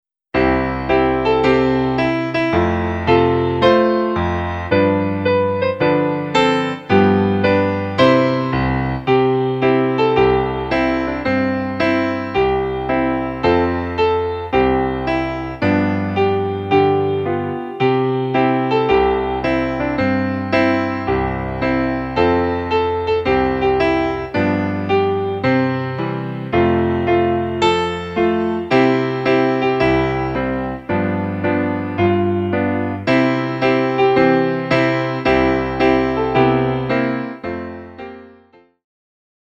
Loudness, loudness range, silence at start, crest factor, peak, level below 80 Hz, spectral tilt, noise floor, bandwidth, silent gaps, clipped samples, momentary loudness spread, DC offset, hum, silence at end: -17 LUFS; 3 LU; 0.35 s; 16 dB; 0 dBFS; -38 dBFS; -7.5 dB/octave; -50 dBFS; 7.8 kHz; none; under 0.1%; 6 LU; under 0.1%; none; 1.2 s